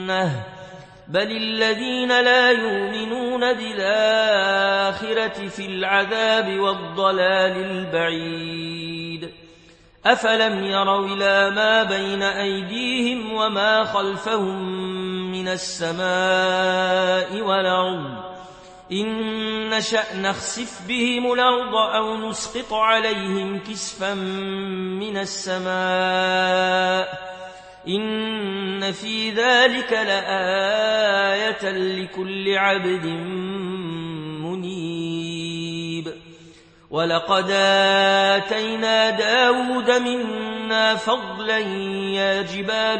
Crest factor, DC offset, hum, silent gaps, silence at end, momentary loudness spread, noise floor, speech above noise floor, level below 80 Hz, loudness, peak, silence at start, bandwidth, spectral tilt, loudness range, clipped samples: 20 dB; under 0.1%; none; none; 0 s; 11 LU; -50 dBFS; 29 dB; -60 dBFS; -21 LUFS; -2 dBFS; 0 s; 8.8 kHz; -3.5 dB/octave; 5 LU; under 0.1%